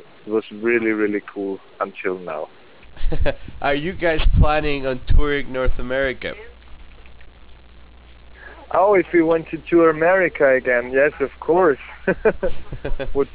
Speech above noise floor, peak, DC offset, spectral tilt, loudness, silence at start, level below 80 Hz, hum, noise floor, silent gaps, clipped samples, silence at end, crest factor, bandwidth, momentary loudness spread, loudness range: 26 dB; -6 dBFS; under 0.1%; -10 dB/octave; -20 LUFS; 0.25 s; -28 dBFS; none; -44 dBFS; none; under 0.1%; 0.05 s; 14 dB; 4 kHz; 13 LU; 8 LU